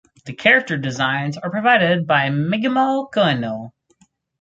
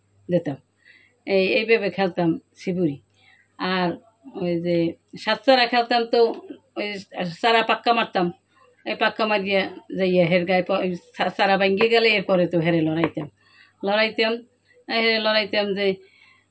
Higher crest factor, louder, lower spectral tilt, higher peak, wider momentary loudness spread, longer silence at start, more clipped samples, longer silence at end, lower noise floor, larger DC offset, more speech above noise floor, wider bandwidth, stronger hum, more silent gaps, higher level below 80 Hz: about the same, 18 dB vs 18 dB; first, -18 LUFS vs -22 LUFS; about the same, -6 dB/octave vs -6.5 dB/octave; about the same, -2 dBFS vs -4 dBFS; about the same, 10 LU vs 12 LU; about the same, 0.25 s vs 0.3 s; neither; first, 0.7 s vs 0.55 s; about the same, -59 dBFS vs -58 dBFS; neither; first, 41 dB vs 36 dB; about the same, 8 kHz vs 8 kHz; neither; neither; about the same, -62 dBFS vs -66 dBFS